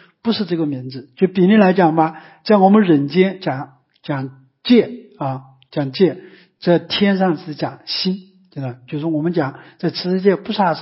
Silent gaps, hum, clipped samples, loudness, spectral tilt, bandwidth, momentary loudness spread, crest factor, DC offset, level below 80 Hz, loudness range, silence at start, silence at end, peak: none; none; under 0.1%; -17 LUFS; -10.5 dB/octave; 5.8 kHz; 17 LU; 16 dB; under 0.1%; -64 dBFS; 6 LU; 0.25 s; 0 s; -2 dBFS